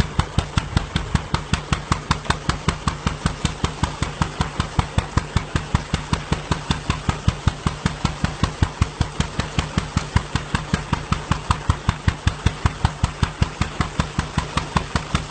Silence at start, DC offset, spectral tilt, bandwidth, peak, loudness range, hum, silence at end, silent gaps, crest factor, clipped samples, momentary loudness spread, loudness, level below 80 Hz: 0 s; under 0.1%; -5 dB/octave; 9.2 kHz; -2 dBFS; 1 LU; none; 0 s; none; 22 dB; under 0.1%; 2 LU; -24 LUFS; -28 dBFS